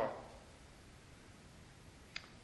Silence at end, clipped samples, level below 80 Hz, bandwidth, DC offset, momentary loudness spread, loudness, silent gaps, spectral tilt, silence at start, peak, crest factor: 0 s; under 0.1%; -66 dBFS; 11.5 kHz; under 0.1%; 9 LU; -53 LUFS; none; -4.5 dB/octave; 0 s; -24 dBFS; 24 dB